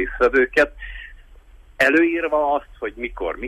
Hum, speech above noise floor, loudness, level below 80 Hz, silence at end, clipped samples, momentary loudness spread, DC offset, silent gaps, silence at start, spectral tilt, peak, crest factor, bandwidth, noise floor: none; 26 dB; -19 LUFS; -40 dBFS; 0 s; under 0.1%; 17 LU; under 0.1%; none; 0 s; -5 dB/octave; -6 dBFS; 16 dB; 13.5 kHz; -46 dBFS